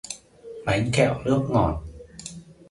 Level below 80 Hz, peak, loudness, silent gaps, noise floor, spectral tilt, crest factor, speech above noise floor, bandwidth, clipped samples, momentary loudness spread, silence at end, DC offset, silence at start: -42 dBFS; -6 dBFS; -24 LUFS; none; -42 dBFS; -6 dB/octave; 20 dB; 20 dB; 11.5 kHz; under 0.1%; 20 LU; 0.2 s; under 0.1%; 0.05 s